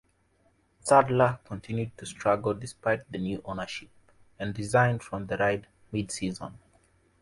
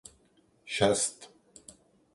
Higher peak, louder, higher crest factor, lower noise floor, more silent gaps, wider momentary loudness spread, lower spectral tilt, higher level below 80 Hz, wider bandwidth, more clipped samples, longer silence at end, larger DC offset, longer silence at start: first, -6 dBFS vs -12 dBFS; about the same, -28 LUFS vs -28 LUFS; about the same, 22 dB vs 22 dB; about the same, -67 dBFS vs -66 dBFS; neither; second, 15 LU vs 26 LU; first, -5.5 dB/octave vs -3 dB/octave; first, -56 dBFS vs -62 dBFS; about the same, 11.5 kHz vs 12 kHz; neither; second, 0.65 s vs 0.9 s; neither; first, 0.85 s vs 0.65 s